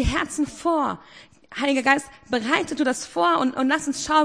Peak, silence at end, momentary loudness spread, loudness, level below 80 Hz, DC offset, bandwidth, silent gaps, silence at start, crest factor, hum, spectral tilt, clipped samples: -2 dBFS; 0 s; 7 LU; -23 LUFS; -40 dBFS; under 0.1%; 10.5 kHz; none; 0 s; 20 dB; none; -4 dB/octave; under 0.1%